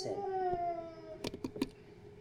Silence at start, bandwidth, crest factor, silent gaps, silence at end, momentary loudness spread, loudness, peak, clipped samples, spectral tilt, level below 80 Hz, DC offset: 0 s; 17 kHz; 20 dB; none; 0 s; 14 LU; -39 LUFS; -20 dBFS; under 0.1%; -5.5 dB/octave; -60 dBFS; under 0.1%